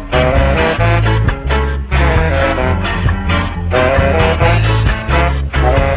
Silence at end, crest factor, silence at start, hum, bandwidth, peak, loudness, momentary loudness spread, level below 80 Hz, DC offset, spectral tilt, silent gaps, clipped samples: 0 s; 12 dB; 0 s; none; 4 kHz; 0 dBFS; -13 LUFS; 4 LU; -16 dBFS; under 0.1%; -10.5 dB/octave; none; under 0.1%